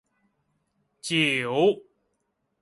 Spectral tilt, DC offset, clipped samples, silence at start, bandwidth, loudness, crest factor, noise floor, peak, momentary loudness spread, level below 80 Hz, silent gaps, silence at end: -4.5 dB/octave; under 0.1%; under 0.1%; 1.05 s; 11.5 kHz; -23 LUFS; 20 dB; -76 dBFS; -10 dBFS; 13 LU; -72 dBFS; none; 0.85 s